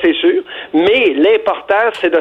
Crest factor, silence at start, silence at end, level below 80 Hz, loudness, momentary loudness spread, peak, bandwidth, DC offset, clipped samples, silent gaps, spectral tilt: 10 dB; 0 s; 0 s; -52 dBFS; -13 LUFS; 5 LU; -2 dBFS; 8.4 kHz; under 0.1%; under 0.1%; none; -5.5 dB/octave